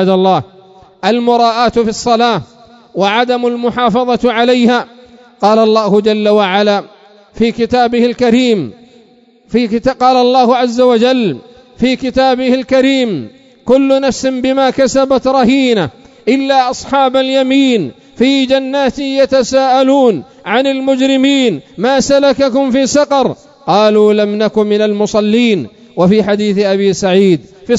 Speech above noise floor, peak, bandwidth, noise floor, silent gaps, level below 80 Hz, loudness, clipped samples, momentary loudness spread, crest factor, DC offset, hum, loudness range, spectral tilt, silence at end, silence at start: 35 dB; 0 dBFS; 8 kHz; -46 dBFS; none; -46 dBFS; -11 LUFS; 0.2%; 7 LU; 12 dB; under 0.1%; none; 2 LU; -5 dB/octave; 0 s; 0 s